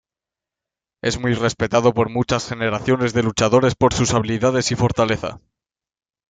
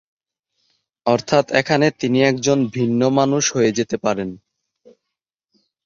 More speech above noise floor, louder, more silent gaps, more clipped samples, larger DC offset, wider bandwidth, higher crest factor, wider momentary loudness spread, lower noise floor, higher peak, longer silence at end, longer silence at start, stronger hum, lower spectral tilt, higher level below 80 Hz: first, 70 dB vs 64 dB; about the same, -19 LUFS vs -18 LUFS; neither; neither; neither; first, 9.4 kHz vs 7.6 kHz; about the same, 18 dB vs 18 dB; about the same, 6 LU vs 6 LU; first, -88 dBFS vs -82 dBFS; about the same, -2 dBFS vs -2 dBFS; second, 0.9 s vs 1.5 s; about the same, 1.05 s vs 1.05 s; neither; about the same, -5 dB/octave vs -4.5 dB/octave; first, -44 dBFS vs -58 dBFS